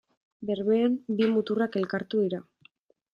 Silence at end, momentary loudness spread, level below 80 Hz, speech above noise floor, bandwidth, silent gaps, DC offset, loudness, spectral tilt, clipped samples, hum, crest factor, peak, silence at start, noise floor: 0.7 s; 8 LU; -74 dBFS; 36 dB; 5.6 kHz; none; under 0.1%; -27 LUFS; -8.5 dB/octave; under 0.1%; none; 14 dB; -14 dBFS; 0.4 s; -62 dBFS